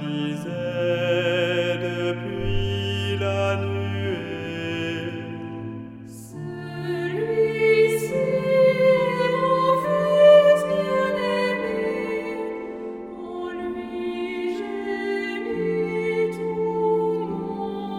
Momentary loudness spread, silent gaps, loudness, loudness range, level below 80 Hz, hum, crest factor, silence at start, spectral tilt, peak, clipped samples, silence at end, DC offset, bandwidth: 15 LU; none; -23 LUFS; 11 LU; -46 dBFS; none; 18 dB; 0 s; -6.5 dB/octave; -4 dBFS; under 0.1%; 0 s; under 0.1%; 16 kHz